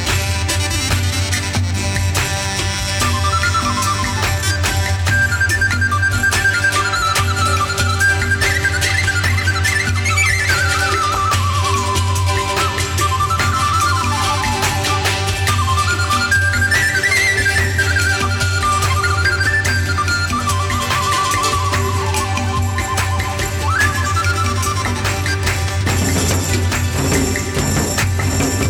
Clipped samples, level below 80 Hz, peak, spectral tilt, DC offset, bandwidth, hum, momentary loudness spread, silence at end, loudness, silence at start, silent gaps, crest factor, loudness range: under 0.1%; -30 dBFS; -2 dBFS; -3.5 dB/octave; under 0.1%; 19 kHz; none; 4 LU; 0 s; -16 LUFS; 0 s; none; 14 dB; 3 LU